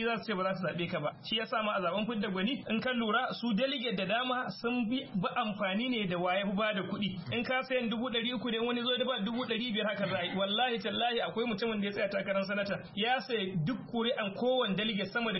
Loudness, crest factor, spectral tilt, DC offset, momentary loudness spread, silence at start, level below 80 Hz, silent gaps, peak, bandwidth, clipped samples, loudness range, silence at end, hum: -33 LUFS; 14 dB; -3 dB/octave; under 0.1%; 4 LU; 0 s; -66 dBFS; none; -18 dBFS; 5.8 kHz; under 0.1%; 1 LU; 0 s; none